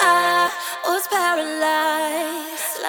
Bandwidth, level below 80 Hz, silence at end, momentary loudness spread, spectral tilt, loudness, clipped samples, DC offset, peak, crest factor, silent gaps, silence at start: over 20 kHz; -76 dBFS; 0 s; 9 LU; -0.5 dB/octave; -20 LUFS; under 0.1%; under 0.1%; -4 dBFS; 18 dB; none; 0 s